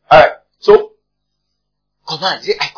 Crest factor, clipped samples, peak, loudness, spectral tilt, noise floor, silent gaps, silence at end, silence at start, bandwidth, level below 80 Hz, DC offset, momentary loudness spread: 14 dB; 1%; 0 dBFS; -12 LUFS; -4.5 dB/octave; -73 dBFS; none; 0.1 s; 0.1 s; 5.4 kHz; -44 dBFS; under 0.1%; 14 LU